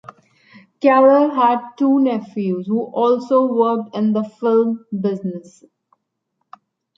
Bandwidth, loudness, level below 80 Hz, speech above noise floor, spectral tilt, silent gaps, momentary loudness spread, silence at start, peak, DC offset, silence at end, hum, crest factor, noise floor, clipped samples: 7.6 kHz; -17 LUFS; -72 dBFS; 57 dB; -8.5 dB/octave; none; 10 LU; 0.8 s; -2 dBFS; under 0.1%; 1.55 s; none; 16 dB; -73 dBFS; under 0.1%